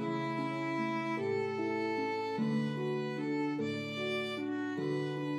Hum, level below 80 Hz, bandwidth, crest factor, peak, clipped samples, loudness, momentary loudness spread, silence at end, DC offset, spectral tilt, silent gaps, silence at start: none; -84 dBFS; 12.5 kHz; 12 dB; -24 dBFS; under 0.1%; -35 LUFS; 2 LU; 0 s; under 0.1%; -6.5 dB/octave; none; 0 s